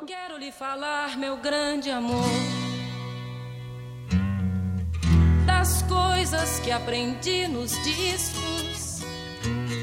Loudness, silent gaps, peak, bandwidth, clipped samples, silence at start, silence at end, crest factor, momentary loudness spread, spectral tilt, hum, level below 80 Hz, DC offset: -26 LUFS; none; -8 dBFS; 16 kHz; under 0.1%; 0 s; 0 s; 18 dB; 14 LU; -4.5 dB/octave; none; -34 dBFS; under 0.1%